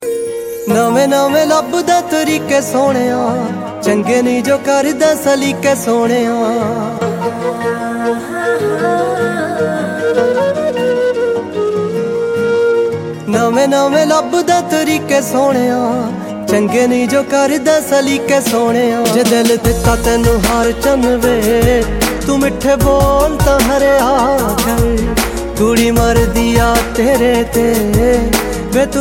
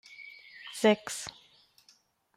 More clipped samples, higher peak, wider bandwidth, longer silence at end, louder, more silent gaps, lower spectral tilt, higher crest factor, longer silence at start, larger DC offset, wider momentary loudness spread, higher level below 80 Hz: neither; first, 0 dBFS vs -12 dBFS; about the same, 17 kHz vs 16 kHz; second, 0 s vs 1.05 s; first, -13 LUFS vs -29 LUFS; neither; first, -5 dB/octave vs -3.5 dB/octave; second, 12 dB vs 22 dB; about the same, 0 s vs 0.1 s; neither; second, 6 LU vs 21 LU; first, -26 dBFS vs -74 dBFS